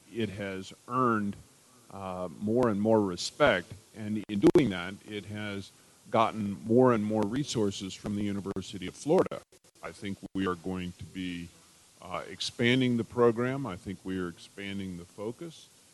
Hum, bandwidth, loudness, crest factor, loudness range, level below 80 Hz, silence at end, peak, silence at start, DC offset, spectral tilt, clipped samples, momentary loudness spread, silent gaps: none; 12 kHz; -30 LUFS; 22 dB; 6 LU; -62 dBFS; 0.3 s; -8 dBFS; 0.1 s; under 0.1%; -6 dB/octave; under 0.1%; 16 LU; none